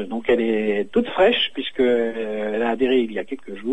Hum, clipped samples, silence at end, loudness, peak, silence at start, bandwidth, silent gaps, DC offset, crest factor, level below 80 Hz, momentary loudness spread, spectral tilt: none; under 0.1%; 0 s; -21 LUFS; -6 dBFS; 0 s; 8.8 kHz; none; 1%; 16 dB; -52 dBFS; 9 LU; -6 dB/octave